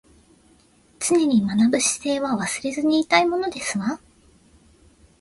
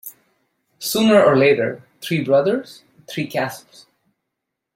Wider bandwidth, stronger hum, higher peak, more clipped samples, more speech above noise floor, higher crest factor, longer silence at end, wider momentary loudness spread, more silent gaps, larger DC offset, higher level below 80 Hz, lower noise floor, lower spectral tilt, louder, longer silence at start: second, 12 kHz vs 16.5 kHz; neither; about the same, -4 dBFS vs -2 dBFS; neither; second, 36 dB vs 62 dB; about the same, 20 dB vs 18 dB; about the same, 1.25 s vs 1.15 s; second, 8 LU vs 18 LU; neither; neither; about the same, -58 dBFS vs -62 dBFS; second, -56 dBFS vs -80 dBFS; second, -3.5 dB/octave vs -5 dB/octave; second, -21 LUFS vs -18 LUFS; first, 1 s vs 0.05 s